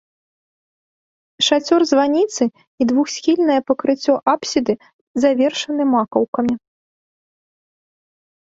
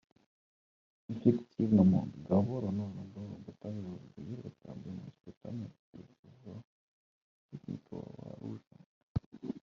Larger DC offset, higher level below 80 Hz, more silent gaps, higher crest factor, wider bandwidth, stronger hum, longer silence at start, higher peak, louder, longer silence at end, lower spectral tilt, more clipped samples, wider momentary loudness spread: neither; about the same, -62 dBFS vs -64 dBFS; second, 2.67-2.78 s, 4.93-5.15 s, 6.28-6.33 s vs 5.37-5.41 s, 5.79-5.93 s, 6.19-6.23 s, 6.64-7.49 s, 8.86-9.15 s, 9.26-9.32 s; second, 18 dB vs 24 dB; first, 7.8 kHz vs 6.4 kHz; neither; first, 1.4 s vs 1.1 s; first, -2 dBFS vs -12 dBFS; first, -18 LUFS vs -34 LUFS; first, 1.9 s vs 0.05 s; second, -3.5 dB/octave vs -10.5 dB/octave; neither; second, 7 LU vs 22 LU